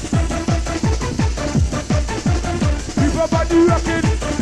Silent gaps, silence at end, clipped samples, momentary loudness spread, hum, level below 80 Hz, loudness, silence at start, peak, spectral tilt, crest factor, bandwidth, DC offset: none; 0 s; under 0.1%; 6 LU; none; -24 dBFS; -18 LUFS; 0 s; -6 dBFS; -6 dB/octave; 12 dB; 12 kHz; under 0.1%